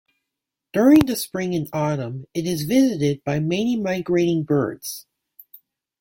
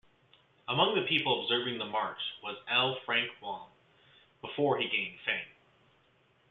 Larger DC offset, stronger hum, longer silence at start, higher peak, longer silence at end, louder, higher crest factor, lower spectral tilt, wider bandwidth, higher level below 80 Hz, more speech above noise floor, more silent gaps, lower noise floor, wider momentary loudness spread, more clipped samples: neither; neither; about the same, 0.75 s vs 0.7 s; first, -2 dBFS vs -12 dBFS; about the same, 1 s vs 1 s; first, -21 LUFS vs -31 LUFS; about the same, 18 dB vs 22 dB; about the same, -6 dB/octave vs -7 dB/octave; first, 17 kHz vs 5.6 kHz; first, -54 dBFS vs -76 dBFS; first, 63 dB vs 36 dB; neither; first, -84 dBFS vs -68 dBFS; about the same, 12 LU vs 14 LU; neither